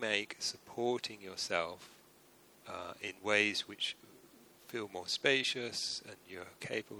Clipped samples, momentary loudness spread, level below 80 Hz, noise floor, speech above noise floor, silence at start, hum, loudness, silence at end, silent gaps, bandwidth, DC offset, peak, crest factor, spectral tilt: under 0.1%; 19 LU; -78 dBFS; -63 dBFS; 26 dB; 0 s; none; -36 LUFS; 0 s; none; over 20 kHz; under 0.1%; -14 dBFS; 26 dB; -2 dB/octave